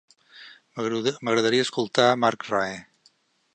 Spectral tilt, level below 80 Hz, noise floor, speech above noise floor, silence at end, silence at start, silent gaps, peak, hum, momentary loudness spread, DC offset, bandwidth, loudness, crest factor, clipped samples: -4 dB/octave; -70 dBFS; -63 dBFS; 40 dB; 0.7 s; 0.35 s; none; -4 dBFS; none; 11 LU; under 0.1%; 9.6 kHz; -24 LUFS; 20 dB; under 0.1%